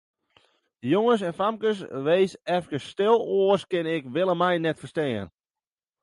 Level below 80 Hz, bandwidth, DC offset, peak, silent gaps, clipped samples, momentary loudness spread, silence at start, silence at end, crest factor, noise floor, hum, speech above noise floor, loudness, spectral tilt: -66 dBFS; 11.5 kHz; under 0.1%; -8 dBFS; none; under 0.1%; 7 LU; 0.85 s; 0.75 s; 18 dB; under -90 dBFS; none; over 66 dB; -25 LUFS; -6.5 dB/octave